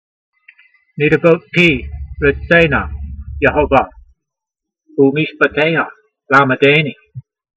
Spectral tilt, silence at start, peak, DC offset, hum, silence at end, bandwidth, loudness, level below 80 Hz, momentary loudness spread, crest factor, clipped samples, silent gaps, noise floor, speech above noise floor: -7 dB/octave; 0.95 s; 0 dBFS; under 0.1%; none; 0.35 s; 8.2 kHz; -13 LUFS; -32 dBFS; 15 LU; 16 dB; under 0.1%; none; -82 dBFS; 69 dB